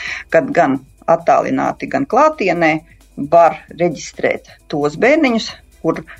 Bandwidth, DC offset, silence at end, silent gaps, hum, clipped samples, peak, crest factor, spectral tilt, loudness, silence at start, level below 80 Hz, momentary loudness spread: 10.5 kHz; under 0.1%; 0.05 s; none; none; under 0.1%; -2 dBFS; 14 dB; -5.5 dB/octave; -15 LUFS; 0 s; -48 dBFS; 10 LU